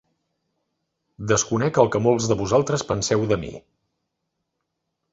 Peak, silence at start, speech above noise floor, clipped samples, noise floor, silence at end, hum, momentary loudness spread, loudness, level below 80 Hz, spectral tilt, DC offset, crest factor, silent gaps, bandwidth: -2 dBFS; 1.2 s; 57 dB; under 0.1%; -78 dBFS; 1.55 s; none; 6 LU; -21 LUFS; -50 dBFS; -5 dB/octave; under 0.1%; 22 dB; none; 8 kHz